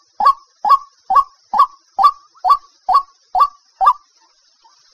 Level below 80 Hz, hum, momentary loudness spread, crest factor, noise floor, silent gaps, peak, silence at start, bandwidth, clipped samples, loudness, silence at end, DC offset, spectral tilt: -54 dBFS; none; 6 LU; 16 dB; -55 dBFS; none; -2 dBFS; 0.2 s; 14 kHz; under 0.1%; -16 LUFS; 1 s; under 0.1%; -1.5 dB/octave